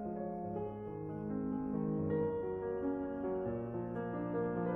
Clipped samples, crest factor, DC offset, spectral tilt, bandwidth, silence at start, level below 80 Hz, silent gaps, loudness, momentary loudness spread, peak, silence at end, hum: under 0.1%; 14 dB; under 0.1%; -11.5 dB/octave; 3.6 kHz; 0 s; -62 dBFS; none; -39 LUFS; 6 LU; -24 dBFS; 0 s; none